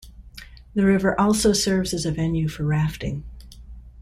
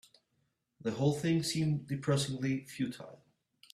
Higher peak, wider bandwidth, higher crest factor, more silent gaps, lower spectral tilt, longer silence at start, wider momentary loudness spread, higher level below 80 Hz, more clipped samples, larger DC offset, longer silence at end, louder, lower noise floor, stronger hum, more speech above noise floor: first, -8 dBFS vs -18 dBFS; first, 15.5 kHz vs 13.5 kHz; about the same, 16 dB vs 18 dB; neither; about the same, -5 dB/octave vs -5.5 dB/octave; second, 0.05 s vs 0.8 s; first, 23 LU vs 9 LU; first, -40 dBFS vs -68 dBFS; neither; neither; second, 0 s vs 0.6 s; first, -22 LUFS vs -34 LUFS; second, -43 dBFS vs -79 dBFS; neither; second, 22 dB vs 46 dB